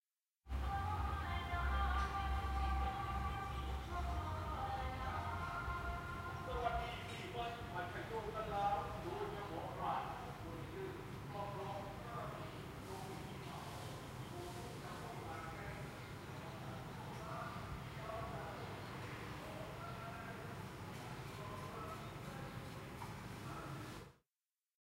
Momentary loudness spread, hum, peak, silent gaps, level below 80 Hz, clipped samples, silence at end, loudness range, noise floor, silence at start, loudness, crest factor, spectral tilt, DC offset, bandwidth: 9 LU; none; -26 dBFS; none; -50 dBFS; under 0.1%; 0.65 s; 8 LU; under -90 dBFS; 0.45 s; -45 LUFS; 20 dB; -5.5 dB/octave; under 0.1%; 16 kHz